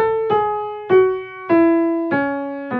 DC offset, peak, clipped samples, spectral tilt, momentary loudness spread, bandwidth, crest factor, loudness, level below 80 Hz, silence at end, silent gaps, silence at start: under 0.1%; -4 dBFS; under 0.1%; -9 dB/octave; 10 LU; 4.5 kHz; 14 dB; -18 LUFS; -56 dBFS; 0 s; none; 0 s